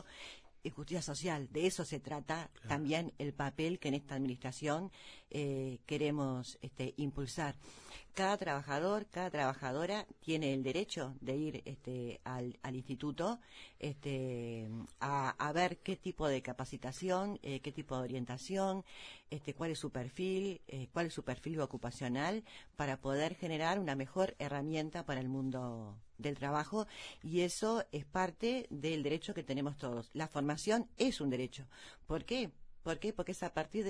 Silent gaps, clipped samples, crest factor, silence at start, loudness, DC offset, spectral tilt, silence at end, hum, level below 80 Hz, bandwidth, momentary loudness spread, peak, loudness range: none; under 0.1%; 20 dB; 0 s; -39 LUFS; under 0.1%; -5.5 dB/octave; 0 s; none; -62 dBFS; 11 kHz; 9 LU; -20 dBFS; 3 LU